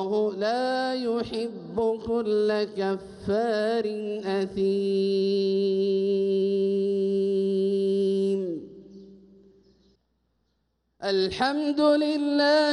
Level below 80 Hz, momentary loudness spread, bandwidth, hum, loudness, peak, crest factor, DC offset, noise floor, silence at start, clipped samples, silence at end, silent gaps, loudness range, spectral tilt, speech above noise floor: -62 dBFS; 7 LU; 11 kHz; none; -25 LUFS; -10 dBFS; 14 dB; under 0.1%; -74 dBFS; 0 s; under 0.1%; 0 s; none; 7 LU; -6.5 dB/octave; 49 dB